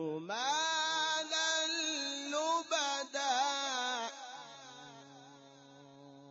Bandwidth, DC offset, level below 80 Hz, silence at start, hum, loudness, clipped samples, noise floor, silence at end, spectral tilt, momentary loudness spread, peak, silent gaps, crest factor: 8 kHz; under 0.1%; under -90 dBFS; 0 s; none; -34 LUFS; under 0.1%; -57 dBFS; 0 s; -0.5 dB/octave; 19 LU; -22 dBFS; none; 16 dB